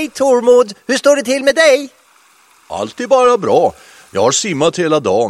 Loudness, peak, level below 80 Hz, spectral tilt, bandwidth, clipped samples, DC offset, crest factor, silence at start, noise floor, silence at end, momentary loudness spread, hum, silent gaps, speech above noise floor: -13 LUFS; 0 dBFS; -56 dBFS; -3.5 dB/octave; 13 kHz; under 0.1%; under 0.1%; 14 dB; 0 s; -49 dBFS; 0 s; 13 LU; none; none; 37 dB